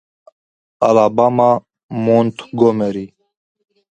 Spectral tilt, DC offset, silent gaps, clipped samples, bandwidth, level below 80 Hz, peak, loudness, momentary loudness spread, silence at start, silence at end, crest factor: -8 dB/octave; under 0.1%; 1.83-1.89 s; under 0.1%; 8.8 kHz; -58 dBFS; 0 dBFS; -15 LUFS; 12 LU; 0.8 s; 0.85 s; 16 dB